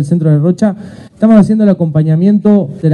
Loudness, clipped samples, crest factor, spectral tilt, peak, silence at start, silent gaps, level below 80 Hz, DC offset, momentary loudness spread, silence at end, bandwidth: -10 LUFS; 0.3%; 10 dB; -9.5 dB/octave; 0 dBFS; 0 s; none; -46 dBFS; under 0.1%; 7 LU; 0 s; 9.4 kHz